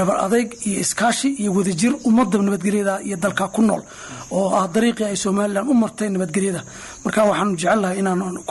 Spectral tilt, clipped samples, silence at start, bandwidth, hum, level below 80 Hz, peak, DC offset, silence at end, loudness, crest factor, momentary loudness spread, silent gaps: -5 dB/octave; under 0.1%; 0 s; 12 kHz; none; -54 dBFS; -6 dBFS; under 0.1%; 0 s; -20 LUFS; 12 dB; 6 LU; none